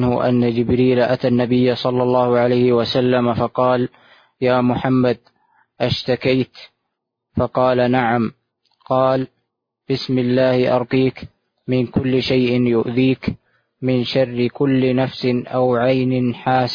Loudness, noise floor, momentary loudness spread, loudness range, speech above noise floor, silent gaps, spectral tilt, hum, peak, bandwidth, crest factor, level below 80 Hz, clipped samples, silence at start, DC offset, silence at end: -18 LUFS; -77 dBFS; 7 LU; 4 LU; 60 dB; none; -8 dB/octave; none; -2 dBFS; 5.2 kHz; 16 dB; -48 dBFS; under 0.1%; 0 s; under 0.1%; 0 s